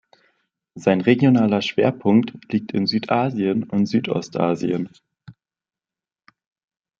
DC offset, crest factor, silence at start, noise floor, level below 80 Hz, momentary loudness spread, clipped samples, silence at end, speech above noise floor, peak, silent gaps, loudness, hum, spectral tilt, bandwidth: under 0.1%; 20 dB; 0.75 s; under -90 dBFS; -64 dBFS; 9 LU; under 0.1%; 1.7 s; over 71 dB; -2 dBFS; none; -20 LUFS; none; -7 dB/octave; 7.4 kHz